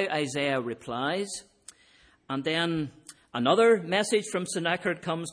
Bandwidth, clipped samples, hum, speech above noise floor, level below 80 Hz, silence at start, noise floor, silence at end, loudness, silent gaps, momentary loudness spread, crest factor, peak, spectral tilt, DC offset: 10.5 kHz; under 0.1%; none; 33 dB; -68 dBFS; 0 s; -60 dBFS; 0 s; -27 LUFS; none; 13 LU; 20 dB; -8 dBFS; -4 dB/octave; under 0.1%